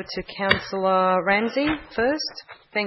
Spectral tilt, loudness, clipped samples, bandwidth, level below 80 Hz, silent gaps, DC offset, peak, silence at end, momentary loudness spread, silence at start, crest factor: -5 dB/octave; -23 LUFS; under 0.1%; 6 kHz; -50 dBFS; none; under 0.1%; 0 dBFS; 0 s; 11 LU; 0 s; 24 dB